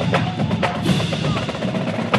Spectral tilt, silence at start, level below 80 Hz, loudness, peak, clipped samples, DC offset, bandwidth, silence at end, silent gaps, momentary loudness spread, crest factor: -6 dB/octave; 0 s; -44 dBFS; -21 LUFS; -2 dBFS; under 0.1%; under 0.1%; 13 kHz; 0 s; none; 3 LU; 18 dB